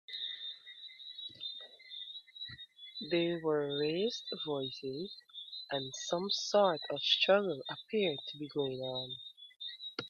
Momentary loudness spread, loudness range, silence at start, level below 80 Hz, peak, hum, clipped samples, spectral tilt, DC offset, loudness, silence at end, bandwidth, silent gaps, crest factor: 17 LU; 6 LU; 0.1 s; -80 dBFS; -16 dBFS; none; under 0.1%; -4 dB/octave; under 0.1%; -35 LUFS; 0 s; 7.6 kHz; none; 22 dB